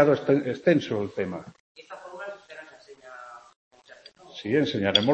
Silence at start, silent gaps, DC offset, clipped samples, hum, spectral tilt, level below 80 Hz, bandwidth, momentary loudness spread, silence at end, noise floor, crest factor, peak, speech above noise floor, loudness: 0 s; 1.60-1.75 s, 3.56-3.71 s; under 0.1%; under 0.1%; none; -6 dB/octave; -68 dBFS; 8.4 kHz; 23 LU; 0 s; -52 dBFS; 24 dB; -2 dBFS; 28 dB; -25 LUFS